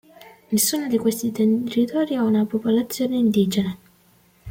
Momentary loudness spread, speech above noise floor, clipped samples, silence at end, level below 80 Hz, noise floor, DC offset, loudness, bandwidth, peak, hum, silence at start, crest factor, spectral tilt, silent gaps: 5 LU; 37 dB; under 0.1%; 0 s; -60 dBFS; -57 dBFS; under 0.1%; -21 LUFS; 16.5 kHz; -6 dBFS; none; 0.2 s; 16 dB; -5 dB/octave; none